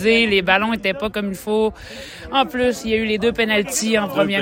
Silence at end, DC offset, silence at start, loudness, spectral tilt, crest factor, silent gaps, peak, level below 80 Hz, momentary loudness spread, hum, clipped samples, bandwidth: 0 s; under 0.1%; 0 s; -19 LUFS; -3.5 dB/octave; 18 dB; none; -2 dBFS; -44 dBFS; 9 LU; none; under 0.1%; 16.5 kHz